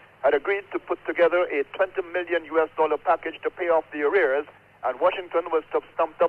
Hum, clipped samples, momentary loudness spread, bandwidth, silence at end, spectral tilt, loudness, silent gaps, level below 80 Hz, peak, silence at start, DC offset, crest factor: none; under 0.1%; 8 LU; 4.5 kHz; 0 s; -6 dB/octave; -25 LUFS; none; -64 dBFS; -10 dBFS; 0.25 s; under 0.1%; 14 dB